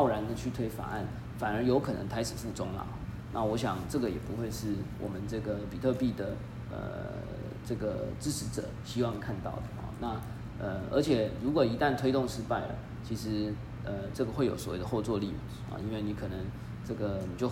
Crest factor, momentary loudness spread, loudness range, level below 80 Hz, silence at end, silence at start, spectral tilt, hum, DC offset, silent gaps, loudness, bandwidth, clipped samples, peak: 18 dB; 11 LU; 5 LU; -48 dBFS; 0 s; 0 s; -6.5 dB/octave; none; under 0.1%; none; -34 LUFS; 16 kHz; under 0.1%; -14 dBFS